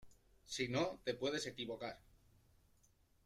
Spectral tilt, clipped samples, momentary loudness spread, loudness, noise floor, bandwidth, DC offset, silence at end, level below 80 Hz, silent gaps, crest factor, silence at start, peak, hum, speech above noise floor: -4 dB/octave; under 0.1%; 10 LU; -42 LUFS; -73 dBFS; 15.5 kHz; under 0.1%; 1.3 s; -72 dBFS; none; 20 dB; 0 s; -24 dBFS; none; 31 dB